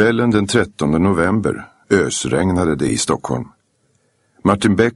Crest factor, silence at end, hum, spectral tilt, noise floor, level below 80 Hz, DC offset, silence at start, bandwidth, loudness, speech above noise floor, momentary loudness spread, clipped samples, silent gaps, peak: 16 dB; 0.05 s; none; -5 dB/octave; -62 dBFS; -42 dBFS; under 0.1%; 0 s; 11.5 kHz; -17 LUFS; 46 dB; 8 LU; under 0.1%; none; 0 dBFS